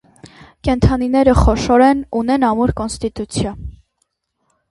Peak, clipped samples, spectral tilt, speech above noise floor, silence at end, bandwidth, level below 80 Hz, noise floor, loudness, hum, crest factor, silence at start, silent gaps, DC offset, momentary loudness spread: 0 dBFS; under 0.1%; -6.5 dB/octave; 54 dB; 1 s; 11.5 kHz; -26 dBFS; -69 dBFS; -16 LUFS; none; 16 dB; 0.65 s; none; under 0.1%; 12 LU